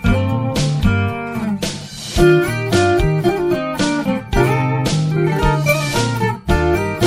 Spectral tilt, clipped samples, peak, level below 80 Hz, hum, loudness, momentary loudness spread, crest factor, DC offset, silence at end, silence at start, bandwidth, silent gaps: -6 dB/octave; under 0.1%; -2 dBFS; -28 dBFS; none; -17 LUFS; 7 LU; 14 dB; under 0.1%; 0 s; 0 s; 16 kHz; none